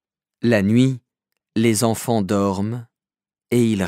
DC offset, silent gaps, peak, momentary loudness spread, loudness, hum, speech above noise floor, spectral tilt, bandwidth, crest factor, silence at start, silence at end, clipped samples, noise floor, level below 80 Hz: under 0.1%; none; -2 dBFS; 11 LU; -20 LUFS; none; over 72 dB; -6 dB/octave; 16 kHz; 18 dB; 0.45 s; 0 s; under 0.1%; under -90 dBFS; -62 dBFS